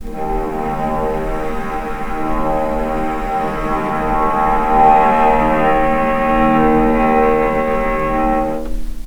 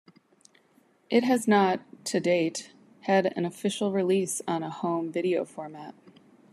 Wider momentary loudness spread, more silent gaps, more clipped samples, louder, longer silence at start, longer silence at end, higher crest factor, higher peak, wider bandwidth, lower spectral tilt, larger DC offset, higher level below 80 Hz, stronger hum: second, 10 LU vs 15 LU; neither; neither; first, -16 LUFS vs -27 LUFS; second, 0 s vs 1.1 s; second, 0 s vs 0.6 s; about the same, 14 dB vs 18 dB; first, 0 dBFS vs -10 dBFS; first, over 20 kHz vs 13 kHz; first, -7 dB/octave vs -5 dB/octave; neither; first, -26 dBFS vs -80 dBFS; neither